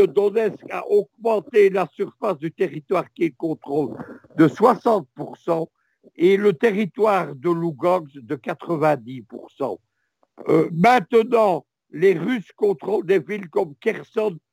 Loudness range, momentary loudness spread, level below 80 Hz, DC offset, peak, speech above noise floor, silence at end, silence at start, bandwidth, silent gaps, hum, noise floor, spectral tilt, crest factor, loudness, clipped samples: 3 LU; 13 LU; -72 dBFS; under 0.1%; -2 dBFS; 48 dB; 0.15 s; 0 s; 16 kHz; none; none; -69 dBFS; -7.5 dB/octave; 18 dB; -21 LUFS; under 0.1%